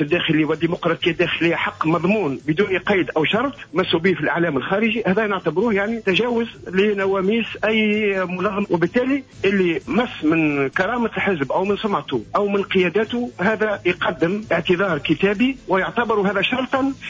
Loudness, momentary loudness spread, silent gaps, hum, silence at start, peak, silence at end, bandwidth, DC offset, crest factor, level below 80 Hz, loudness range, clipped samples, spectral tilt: -20 LUFS; 3 LU; none; none; 0 s; -6 dBFS; 0 s; 7.6 kHz; under 0.1%; 14 dB; -50 dBFS; 1 LU; under 0.1%; -6.5 dB/octave